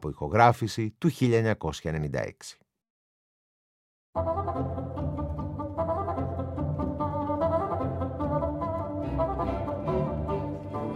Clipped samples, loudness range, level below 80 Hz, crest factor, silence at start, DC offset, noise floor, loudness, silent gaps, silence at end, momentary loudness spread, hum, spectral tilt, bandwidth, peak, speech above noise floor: under 0.1%; 7 LU; -44 dBFS; 26 dB; 0 s; under 0.1%; under -90 dBFS; -29 LUFS; 2.90-4.13 s; 0 s; 9 LU; none; -7 dB/octave; 14.5 kHz; -4 dBFS; over 63 dB